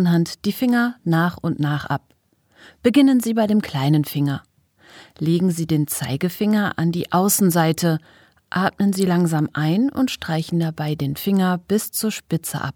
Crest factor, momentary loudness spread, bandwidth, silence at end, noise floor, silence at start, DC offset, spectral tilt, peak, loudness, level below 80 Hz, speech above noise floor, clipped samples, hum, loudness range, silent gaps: 18 dB; 8 LU; 19 kHz; 0.05 s; -50 dBFS; 0 s; under 0.1%; -5.5 dB/octave; -2 dBFS; -20 LUFS; -58 dBFS; 31 dB; under 0.1%; none; 2 LU; none